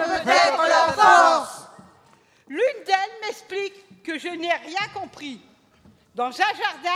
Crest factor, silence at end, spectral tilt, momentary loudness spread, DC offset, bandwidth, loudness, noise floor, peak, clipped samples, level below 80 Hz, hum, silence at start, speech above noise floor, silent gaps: 18 dB; 0 s; -2 dB/octave; 20 LU; under 0.1%; 15 kHz; -20 LUFS; -57 dBFS; -4 dBFS; under 0.1%; -66 dBFS; none; 0 s; 30 dB; none